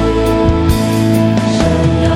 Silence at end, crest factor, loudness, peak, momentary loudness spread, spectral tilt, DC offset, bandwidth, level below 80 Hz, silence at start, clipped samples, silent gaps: 0 s; 10 dB; -12 LUFS; 0 dBFS; 1 LU; -6.5 dB/octave; under 0.1%; 16.5 kHz; -22 dBFS; 0 s; under 0.1%; none